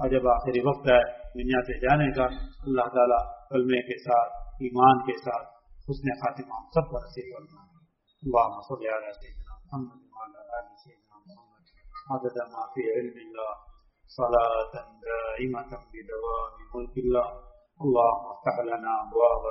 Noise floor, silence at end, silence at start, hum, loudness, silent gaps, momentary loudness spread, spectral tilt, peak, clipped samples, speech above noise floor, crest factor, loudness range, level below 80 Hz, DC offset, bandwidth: -64 dBFS; 0 s; 0 s; none; -27 LUFS; none; 19 LU; -5 dB/octave; -6 dBFS; under 0.1%; 37 dB; 22 dB; 11 LU; -44 dBFS; under 0.1%; 5.8 kHz